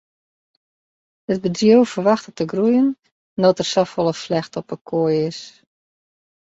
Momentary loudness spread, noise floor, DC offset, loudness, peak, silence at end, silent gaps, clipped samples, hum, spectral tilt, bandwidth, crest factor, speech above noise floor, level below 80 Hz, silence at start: 15 LU; under -90 dBFS; under 0.1%; -19 LUFS; -2 dBFS; 1.1 s; 3.12-3.37 s, 4.81-4.85 s; under 0.1%; none; -6 dB/octave; 8 kHz; 18 dB; over 72 dB; -62 dBFS; 1.3 s